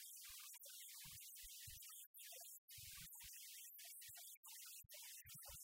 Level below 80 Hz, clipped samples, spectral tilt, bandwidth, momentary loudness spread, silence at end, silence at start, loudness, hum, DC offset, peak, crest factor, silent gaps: -78 dBFS; under 0.1%; 0.5 dB/octave; 16 kHz; 2 LU; 0 s; 0 s; -56 LUFS; none; under 0.1%; -44 dBFS; 16 dB; 2.07-2.14 s, 2.58-2.68 s, 4.37-4.43 s